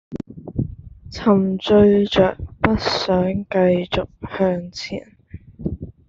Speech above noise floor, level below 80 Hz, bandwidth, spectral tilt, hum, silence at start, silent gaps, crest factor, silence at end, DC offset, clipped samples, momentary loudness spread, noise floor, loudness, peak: 22 dB; -42 dBFS; 7.6 kHz; -7 dB/octave; none; 0.1 s; none; 18 dB; 0.2 s; under 0.1%; under 0.1%; 16 LU; -40 dBFS; -19 LUFS; -2 dBFS